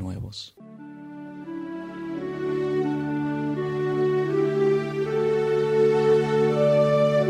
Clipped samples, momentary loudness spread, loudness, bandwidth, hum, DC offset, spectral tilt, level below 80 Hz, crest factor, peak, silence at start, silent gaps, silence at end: under 0.1%; 19 LU; -23 LUFS; 10.5 kHz; none; under 0.1%; -7.5 dB/octave; -58 dBFS; 14 dB; -10 dBFS; 0 s; none; 0 s